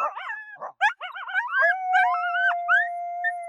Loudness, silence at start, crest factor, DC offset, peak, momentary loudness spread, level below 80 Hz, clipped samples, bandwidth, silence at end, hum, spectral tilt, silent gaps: -23 LUFS; 0 s; 16 dB; under 0.1%; -10 dBFS; 14 LU; under -90 dBFS; under 0.1%; 11 kHz; 0 s; none; 1 dB/octave; none